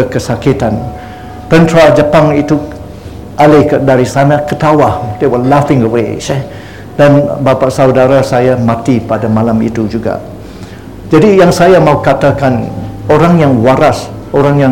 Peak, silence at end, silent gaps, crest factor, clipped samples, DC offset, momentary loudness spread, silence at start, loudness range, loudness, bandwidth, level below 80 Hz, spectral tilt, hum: 0 dBFS; 0 s; none; 8 dB; 2%; 0.8%; 19 LU; 0 s; 2 LU; -9 LUFS; 17.5 kHz; -32 dBFS; -7 dB/octave; none